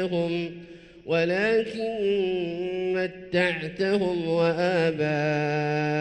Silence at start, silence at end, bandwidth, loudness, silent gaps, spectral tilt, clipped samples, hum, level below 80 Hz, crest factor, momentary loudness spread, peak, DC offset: 0 s; 0 s; 9.4 kHz; -25 LUFS; none; -6.5 dB/octave; under 0.1%; none; -60 dBFS; 16 dB; 6 LU; -10 dBFS; under 0.1%